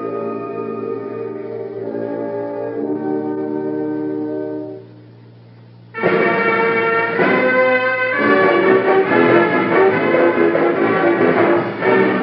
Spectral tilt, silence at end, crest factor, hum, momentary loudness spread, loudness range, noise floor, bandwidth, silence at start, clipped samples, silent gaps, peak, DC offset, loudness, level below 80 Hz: -4.5 dB/octave; 0 s; 16 dB; none; 13 LU; 10 LU; -41 dBFS; 5.6 kHz; 0 s; under 0.1%; none; 0 dBFS; under 0.1%; -16 LUFS; -72 dBFS